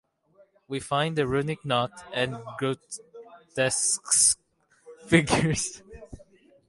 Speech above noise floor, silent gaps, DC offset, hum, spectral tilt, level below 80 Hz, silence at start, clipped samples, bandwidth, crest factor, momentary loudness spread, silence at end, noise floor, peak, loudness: 35 dB; none; under 0.1%; none; -3 dB/octave; -54 dBFS; 0.7 s; under 0.1%; 12 kHz; 24 dB; 17 LU; 0.5 s; -61 dBFS; -6 dBFS; -25 LUFS